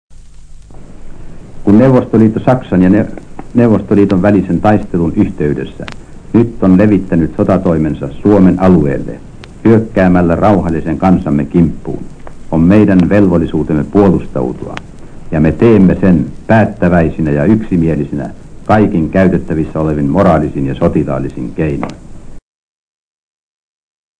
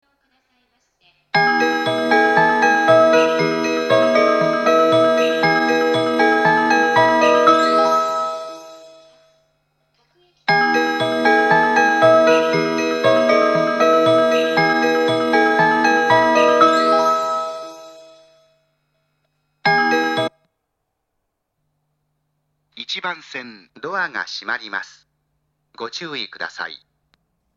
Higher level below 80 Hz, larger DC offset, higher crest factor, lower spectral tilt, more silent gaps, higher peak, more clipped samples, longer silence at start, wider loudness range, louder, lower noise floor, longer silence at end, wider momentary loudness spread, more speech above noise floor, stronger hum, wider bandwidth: first, -30 dBFS vs -68 dBFS; neither; second, 12 dB vs 18 dB; first, -9.5 dB/octave vs -4.5 dB/octave; neither; about the same, 0 dBFS vs 0 dBFS; first, 2% vs under 0.1%; second, 0.1 s vs 1.35 s; second, 3 LU vs 13 LU; first, -11 LUFS vs -16 LUFS; second, -31 dBFS vs -75 dBFS; first, 1.8 s vs 0.8 s; second, 12 LU vs 15 LU; second, 21 dB vs 46 dB; neither; second, 9.4 kHz vs 12.5 kHz